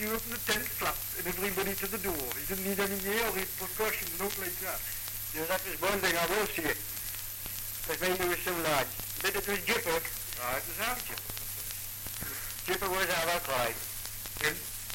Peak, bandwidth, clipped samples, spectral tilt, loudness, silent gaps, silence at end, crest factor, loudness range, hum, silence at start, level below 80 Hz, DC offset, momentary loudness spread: -14 dBFS; 17 kHz; under 0.1%; -2.5 dB/octave; -32 LUFS; none; 0 s; 20 dB; 2 LU; none; 0 s; -50 dBFS; under 0.1%; 7 LU